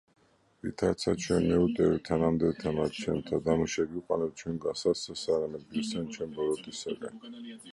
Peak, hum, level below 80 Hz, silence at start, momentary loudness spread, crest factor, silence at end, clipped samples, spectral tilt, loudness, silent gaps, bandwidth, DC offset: -12 dBFS; none; -54 dBFS; 0.65 s; 11 LU; 18 dB; 0 s; under 0.1%; -5.5 dB/octave; -31 LUFS; none; 11.5 kHz; under 0.1%